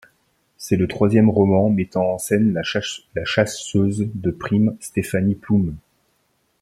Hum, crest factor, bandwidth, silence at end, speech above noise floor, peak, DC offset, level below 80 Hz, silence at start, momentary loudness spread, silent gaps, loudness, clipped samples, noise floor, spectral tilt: none; 18 dB; 14 kHz; 0.85 s; 47 dB; -2 dBFS; under 0.1%; -50 dBFS; 0.6 s; 10 LU; none; -20 LUFS; under 0.1%; -66 dBFS; -6 dB/octave